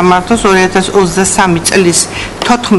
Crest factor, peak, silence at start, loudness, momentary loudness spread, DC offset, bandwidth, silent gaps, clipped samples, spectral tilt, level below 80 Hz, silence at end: 10 dB; 0 dBFS; 0 s; -9 LUFS; 4 LU; under 0.1%; 12 kHz; none; 0.7%; -3.5 dB/octave; -32 dBFS; 0 s